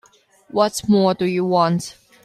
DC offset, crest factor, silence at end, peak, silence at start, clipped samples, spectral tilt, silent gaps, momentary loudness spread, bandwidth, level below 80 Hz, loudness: under 0.1%; 16 dB; 0.3 s; -4 dBFS; 0.55 s; under 0.1%; -6 dB/octave; none; 9 LU; 14 kHz; -58 dBFS; -19 LUFS